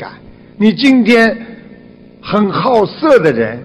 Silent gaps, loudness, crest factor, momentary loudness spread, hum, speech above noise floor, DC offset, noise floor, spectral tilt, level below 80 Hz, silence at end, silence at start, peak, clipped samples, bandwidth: none; -11 LUFS; 12 dB; 19 LU; none; 27 dB; under 0.1%; -38 dBFS; -6.5 dB/octave; -48 dBFS; 0 s; 0 s; 0 dBFS; under 0.1%; 11.5 kHz